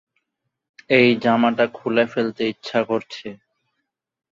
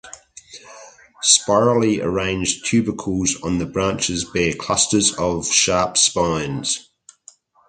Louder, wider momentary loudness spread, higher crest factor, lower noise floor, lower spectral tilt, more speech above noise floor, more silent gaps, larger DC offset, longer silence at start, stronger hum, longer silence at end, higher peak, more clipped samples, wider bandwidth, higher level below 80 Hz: about the same, -19 LUFS vs -18 LUFS; first, 14 LU vs 8 LU; about the same, 20 dB vs 20 dB; first, -78 dBFS vs -50 dBFS; first, -6.5 dB/octave vs -3 dB/octave; first, 59 dB vs 31 dB; neither; neither; first, 0.9 s vs 0.05 s; neither; first, 1 s vs 0.85 s; about the same, -2 dBFS vs 0 dBFS; neither; second, 7.4 kHz vs 9.6 kHz; second, -66 dBFS vs -44 dBFS